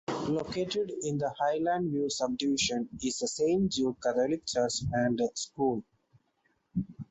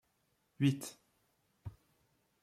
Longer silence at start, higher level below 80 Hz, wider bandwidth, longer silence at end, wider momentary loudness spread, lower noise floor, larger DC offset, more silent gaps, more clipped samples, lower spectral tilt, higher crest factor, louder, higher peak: second, 0.1 s vs 0.6 s; first, -60 dBFS vs -70 dBFS; second, 8.4 kHz vs 15 kHz; second, 0.05 s vs 0.7 s; second, 5 LU vs 19 LU; second, -74 dBFS vs -78 dBFS; neither; neither; neither; second, -4.5 dB/octave vs -6 dB/octave; second, 16 dB vs 22 dB; first, -31 LUFS vs -35 LUFS; first, -16 dBFS vs -20 dBFS